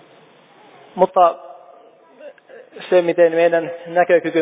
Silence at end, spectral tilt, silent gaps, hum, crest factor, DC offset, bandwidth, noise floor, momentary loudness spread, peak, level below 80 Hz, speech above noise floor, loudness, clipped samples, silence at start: 0 s; -9.5 dB/octave; none; none; 18 dB; under 0.1%; 4 kHz; -49 dBFS; 17 LU; -2 dBFS; -70 dBFS; 33 dB; -16 LUFS; under 0.1%; 0.95 s